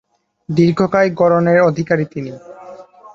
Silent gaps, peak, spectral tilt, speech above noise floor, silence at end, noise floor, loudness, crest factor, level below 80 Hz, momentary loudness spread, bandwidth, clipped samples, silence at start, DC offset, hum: none; 0 dBFS; -8 dB/octave; 23 dB; 0.05 s; -37 dBFS; -15 LUFS; 16 dB; -54 dBFS; 21 LU; 7.4 kHz; under 0.1%; 0.5 s; under 0.1%; none